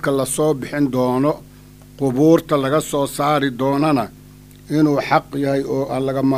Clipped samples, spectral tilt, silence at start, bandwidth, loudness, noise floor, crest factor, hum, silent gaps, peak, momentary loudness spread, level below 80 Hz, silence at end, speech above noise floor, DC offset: under 0.1%; -6 dB/octave; 0 s; 15.5 kHz; -18 LUFS; -42 dBFS; 18 dB; none; none; 0 dBFS; 6 LU; -48 dBFS; 0 s; 25 dB; under 0.1%